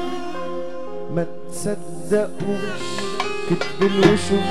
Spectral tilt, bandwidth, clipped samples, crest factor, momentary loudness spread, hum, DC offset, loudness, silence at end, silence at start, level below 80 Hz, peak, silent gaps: -5.5 dB/octave; 14 kHz; under 0.1%; 20 dB; 13 LU; none; 4%; -23 LUFS; 0 s; 0 s; -50 dBFS; -2 dBFS; none